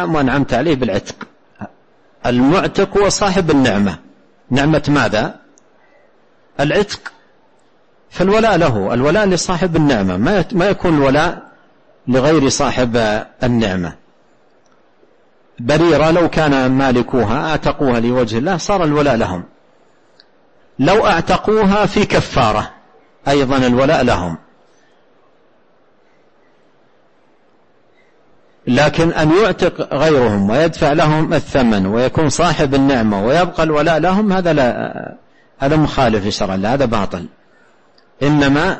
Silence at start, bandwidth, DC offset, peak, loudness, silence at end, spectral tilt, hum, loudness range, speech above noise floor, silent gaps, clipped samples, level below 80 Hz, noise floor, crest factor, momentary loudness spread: 0 s; 8.8 kHz; 0.6%; -2 dBFS; -14 LUFS; 0 s; -5.5 dB/octave; none; 5 LU; 41 dB; none; under 0.1%; -34 dBFS; -55 dBFS; 12 dB; 11 LU